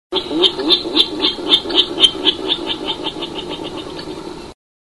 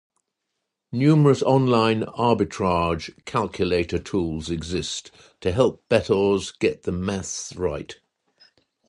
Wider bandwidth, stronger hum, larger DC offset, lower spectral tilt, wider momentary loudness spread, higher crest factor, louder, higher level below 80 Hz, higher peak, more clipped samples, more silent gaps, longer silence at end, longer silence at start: about the same, 11.5 kHz vs 11 kHz; neither; first, 0.4% vs under 0.1%; second, -3 dB/octave vs -6 dB/octave; first, 17 LU vs 12 LU; about the same, 18 dB vs 20 dB; first, -15 LUFS vs -23 LUFS; about the same, -46 dBFS vs -44 dBFS; first, 0 dBFS vs -4 dBFS; neither; neither; second, 0.4 s vs 0.95 s; second, 0.1 s vs 0.9 s